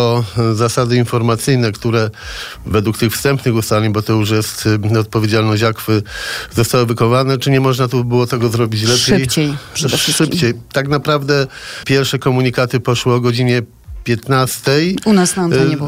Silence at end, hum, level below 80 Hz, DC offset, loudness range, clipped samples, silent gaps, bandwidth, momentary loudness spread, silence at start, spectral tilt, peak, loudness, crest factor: 0 s; none; -40 dBFS; under 0.1%; 2 LU; under 0.1%; none; 16 kHz; 6 LU; 0 s; -5 dB/octave; -2 dBFS; -14 LUFS; 12 dB